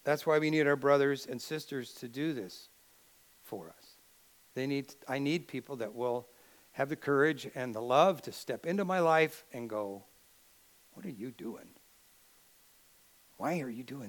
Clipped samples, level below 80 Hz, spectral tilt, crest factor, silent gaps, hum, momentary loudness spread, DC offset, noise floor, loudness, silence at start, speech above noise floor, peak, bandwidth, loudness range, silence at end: under 0.1%; -82 dBFS; -5.5 dB/octave; 22 dB; none; none; 19 LU; under 0.1%; -64 dBFS; -33 LUFS; 0.05 s; 31 dB; -12 dBFS; 19 kHz; 14 LU; 0 s